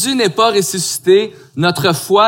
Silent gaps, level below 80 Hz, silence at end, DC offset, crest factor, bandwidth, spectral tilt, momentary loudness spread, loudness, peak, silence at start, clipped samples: none; -60 dBFS; 0 s; under 0.1%; 14 dB; 17 kHz; -3.5 dB/octave; 5 LU; -14 LUFS; 0 dBFS; 0 s; under 0.1%